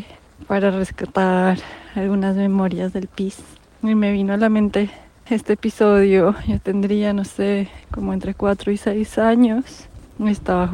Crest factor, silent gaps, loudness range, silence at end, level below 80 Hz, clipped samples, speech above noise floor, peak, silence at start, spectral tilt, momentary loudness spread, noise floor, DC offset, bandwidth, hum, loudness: 14 dB; none; 3 LU; 0 s; -42 dBFS; under 0.1%; 21 dB; -4 dBFS; 0 s; -7.5 dB/octave; 10 LU; -40 dBFS; under 0.1%; 11.5 kHz; none; -19 LUFS